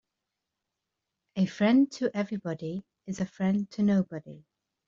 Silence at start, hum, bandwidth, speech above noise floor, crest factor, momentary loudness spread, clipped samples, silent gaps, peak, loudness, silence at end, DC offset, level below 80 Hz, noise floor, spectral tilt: 1.35 s; none; 7.6 kHz; 58 dB; 16 dB; 16 LU; under 0.1%; none; -14 dBFS; -28 LUFS; 0.5 s; under 0.1%; -70 dBFS; -86 dBFS; -7 dB/octave